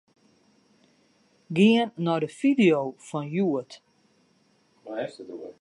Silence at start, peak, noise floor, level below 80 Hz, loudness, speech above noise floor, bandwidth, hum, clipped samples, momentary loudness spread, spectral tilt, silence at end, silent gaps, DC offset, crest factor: 1.5 s; -8 dBFS; -65 dBFS; -76 dBFS; -25 LUFS; 41 dB; 11 kHz; none; under 0.1%; 17 LU; -6.5 dB/octave; 0.1 s; none; under 0.1%; 20 dB